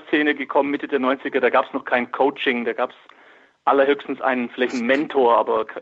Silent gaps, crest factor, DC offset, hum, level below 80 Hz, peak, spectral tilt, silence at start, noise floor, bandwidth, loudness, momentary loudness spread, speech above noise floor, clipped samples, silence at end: none; 16 dB; under 0.1%; none; -70 dBFS; -4 dBFS; -5 dB/octave; 0.05 s; -52 dBFS; 7.8 kHz; -21 LUFS; 6 LU; 31 dB; under 0.1%; 0 s